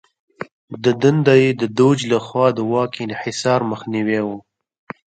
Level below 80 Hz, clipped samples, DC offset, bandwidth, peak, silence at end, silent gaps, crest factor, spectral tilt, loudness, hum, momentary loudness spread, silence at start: -60 dBFS; under 0.1%; under 0.1%; 9.2 kHz; 0 dBFS; 0.65 s; 0.52-0.68 s; 18 dB; -6 dB/octave; -18 LUFS; none; 20 LU; 0.4 s